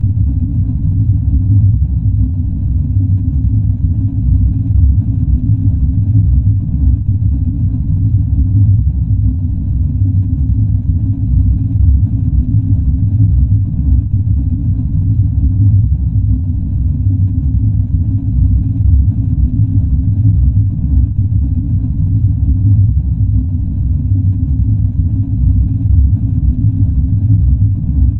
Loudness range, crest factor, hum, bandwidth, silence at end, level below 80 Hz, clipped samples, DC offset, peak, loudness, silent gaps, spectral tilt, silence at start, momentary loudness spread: 1 LU; 10 dB; none; 1 kHz; 0 s; -16 dBFS; under 0.1%; under 0.1%; 0 dBFS; -13 LUFS; none; -14 dB/octave; 0 s; 4 LU